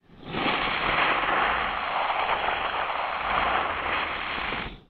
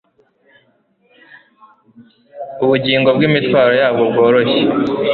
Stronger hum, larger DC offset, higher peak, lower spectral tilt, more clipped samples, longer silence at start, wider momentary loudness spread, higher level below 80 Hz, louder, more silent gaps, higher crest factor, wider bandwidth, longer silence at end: neither; neither; second, -10 dBFS vs -2 dBFS; second, -6.5 dB/octave vs -8.5 dB/octave; neither; second, 0.1 s vs 2 s; about the same, 6 LU vs 6 LU; first, -48 dBFS vs -54 dBFS; second, -26 LUFS vs -13 LUFS; neither; about the same, 16 dB vs 14 dB; first, 6 kHz vs 4.7 kHz; about the same, 0.1 s vs 0 s